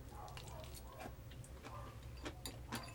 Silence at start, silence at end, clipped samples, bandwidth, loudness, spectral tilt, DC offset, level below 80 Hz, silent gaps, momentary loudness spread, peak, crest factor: 0 s; 0 s; under 0.1%; over 20 kHz; -52 LUFS; -4.5 dB/octave; under 0.1%; -56 dBFS; none; 5 LU; -28 dBFS; 22 dB